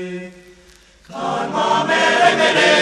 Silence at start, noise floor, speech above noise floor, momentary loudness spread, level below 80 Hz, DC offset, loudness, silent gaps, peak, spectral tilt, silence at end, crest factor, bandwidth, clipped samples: 0 s; -48 dBFS; 30 dB; 18 LU; -56 dBFS; under 0.1%; -15 LUFS; none; 0 dBFS; -3 dB/octave; 0 s; 16 dB; 12 kHz; under 0.1%